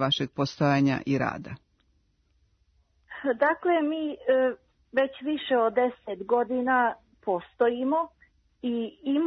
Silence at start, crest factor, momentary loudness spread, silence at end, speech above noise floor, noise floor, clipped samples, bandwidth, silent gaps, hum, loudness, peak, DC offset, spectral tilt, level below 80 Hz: 0 s; 16 dB; 13 LU; 0 s; 42 dB; -68 dBFS; under 0.1%; 6.6 kHz; none; none; -27 LUFS; -12 dBFS; under 0.1%; -6.5 dB/octave; -64 dBFS